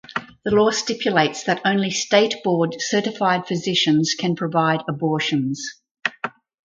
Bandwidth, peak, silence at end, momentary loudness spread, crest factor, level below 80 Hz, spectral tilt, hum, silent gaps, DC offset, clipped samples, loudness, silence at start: 9.4 kHz; -4 dBFS; 0.35 s; 10 LU; 18 dB; -60 dBFS; -4 dB/octave; none; 5.91-5.95 s; under 0.1%; under 0.1%; -20 LUFS; 0.1 s